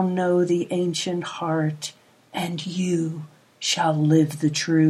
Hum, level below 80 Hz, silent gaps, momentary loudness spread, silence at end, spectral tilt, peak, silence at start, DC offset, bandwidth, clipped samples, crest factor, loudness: none; -72 dBFS; none; 11 LU; 0 s; -5.5 dB/octave; -6 dBFS; 0 s; under 0.1%; 14.5 kHz; under 0.1%; 16 dB; -23 LUFS